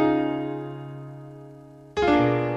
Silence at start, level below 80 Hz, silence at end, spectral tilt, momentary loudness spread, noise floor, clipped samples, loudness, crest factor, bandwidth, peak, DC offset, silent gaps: 0 s; -50 dBFS; 0 s; -7.5 dB/octave; 23 LU; -45 dBFS; under 0.1%; -24 LUFS; 16 dB; 7.6 kHz; -8 dBFS; under 0.1%; none